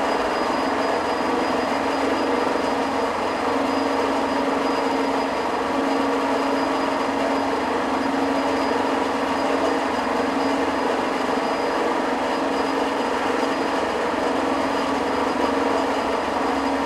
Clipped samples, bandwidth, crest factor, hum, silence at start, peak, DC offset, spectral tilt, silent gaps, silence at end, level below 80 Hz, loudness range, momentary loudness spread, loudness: under 0.1%; 14 kHz; 14 dB; none; 0 s; -8 dBFS; under 0.1%; -4 dB/octave; none; 0 s; -52 dBFS; 0 LU; 1 LU; -22 LUFS